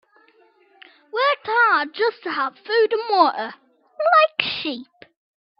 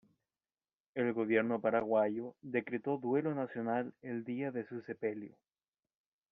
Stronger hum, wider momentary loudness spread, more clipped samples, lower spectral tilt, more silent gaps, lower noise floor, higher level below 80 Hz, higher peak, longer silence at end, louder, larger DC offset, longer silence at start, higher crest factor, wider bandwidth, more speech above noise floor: neither; first, 14 LU vs 11 LU; neither; about the same, -5.5 dB/octave vs -6 dB/octave; neither; second, -57 dBFS vs under -90 dBFS; first, -72 dBFS vs -80 dBFS; first, -2 dBFS vs -18 dBFS; second, 0.75 s vs 1.05 s; first, -20 LUFS vs -36 LUFS; neither; first, 1.15 s vs 0.95 s; about the same, 20 dB vs 20 dB; first, 6 kHz vs 4.9 kHz; second, 35 dB vs over 55 dB